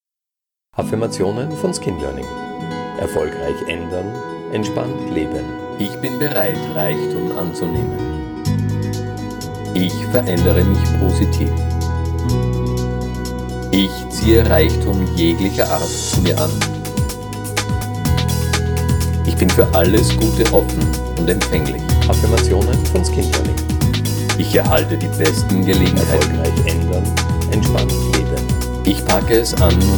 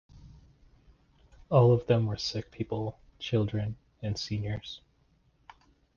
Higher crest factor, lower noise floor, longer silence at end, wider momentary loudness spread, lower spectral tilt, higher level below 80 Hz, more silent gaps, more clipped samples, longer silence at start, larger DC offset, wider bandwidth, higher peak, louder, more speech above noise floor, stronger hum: second, 16 dB vs 22 dB; first, -86 dBFS vs -67 dBFS; second, 0 s vs 1.2 s; second, 10 LU vs 16 LU; second, -5.5 dB/octave vs -7 dB/octave; first, -24 dBFS vs -54 dBFS; neither; neither; first, 0.75 s vs 0.15 s; neither; first, over 20 kHz vs 7.2 kHz; first, 0 dBFS vs -10 dBFS; first, -17 LUFS vs -30 LUFS; first, 70 dB vs 39 dB; neither